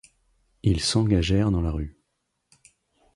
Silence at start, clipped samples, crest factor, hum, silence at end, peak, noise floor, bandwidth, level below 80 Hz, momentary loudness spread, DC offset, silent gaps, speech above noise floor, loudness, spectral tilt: 0.65 s; under 0.1%; 18 dB; none; 1.25 s; -8 dBFS; -77 dBFS; 11.5 kHz; -36 dBFS; 10 LU; under 0.1%; none; 55 dB; -24 LUFS; -5.5 dB/octave